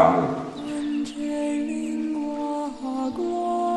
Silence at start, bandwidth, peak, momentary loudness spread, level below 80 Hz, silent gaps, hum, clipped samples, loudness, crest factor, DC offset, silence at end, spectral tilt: 0 s; 11.5 kHz; -4 dBFS; 5 LU; -56 dBFS; none; none; under 0.1%; -27 LUFS; 22 dB; under 0.1%; 0 s; -6.5 dB/octave